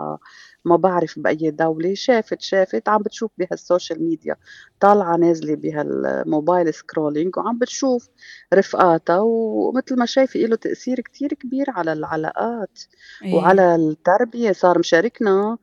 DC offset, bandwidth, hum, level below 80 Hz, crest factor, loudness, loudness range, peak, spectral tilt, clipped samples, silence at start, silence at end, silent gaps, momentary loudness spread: under 0.1%; 7.4 kHz; none; -66 dBFS; 18 dB; -19 LUFS; 3 LU; 0 dBFS; -5.5 dB/octave; under 0.1%; 0 s; 0.05 s; none; 10 LU